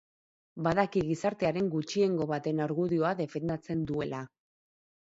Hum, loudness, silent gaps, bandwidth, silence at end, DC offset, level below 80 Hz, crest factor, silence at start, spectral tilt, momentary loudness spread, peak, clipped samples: none; -31 LUFS; none; 8 kHz; 0.8 s; under 0.1%; -62 dBFS; 20 dB; 0.55 s; -7 dB/octave; 7 LU; -10 dBFS; under 0.1%